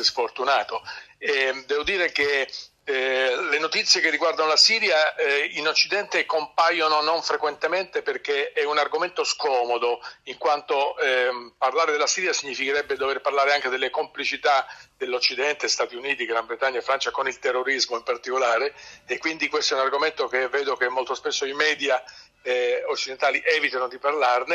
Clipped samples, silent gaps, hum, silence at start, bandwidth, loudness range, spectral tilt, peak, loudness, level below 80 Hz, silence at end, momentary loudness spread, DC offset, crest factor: under 0.1%; none; none; 0 s; 11.5 kHz; 5 LU; 0 dB/octave; -6 dBFS; -23 LUFS; -66 dBFS; 0 s; 7 LU; under 0.1%; 18 dB